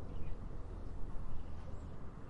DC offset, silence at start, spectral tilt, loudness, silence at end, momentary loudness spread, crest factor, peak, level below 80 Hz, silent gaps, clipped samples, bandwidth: under 0.1%; 0 s; -8 dB/octave; -50 LUFS; 0 s; 2 LU; 12 dB; -26 dBFS; -46 dBFS; none; under 0.1%; 4.3 kHz